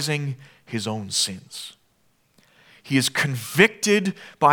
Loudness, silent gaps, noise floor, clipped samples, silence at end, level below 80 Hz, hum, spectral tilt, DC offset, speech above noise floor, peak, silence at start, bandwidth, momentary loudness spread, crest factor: -22 LUFS; none; -64 dBFS; under 0.1%; 0 s; -68 dBFS; none; -3.5 dB/octave; under 0.1%; 41 dB; 0 dBFS; 0 s; over 20 kHz; 18 LU; 24 dB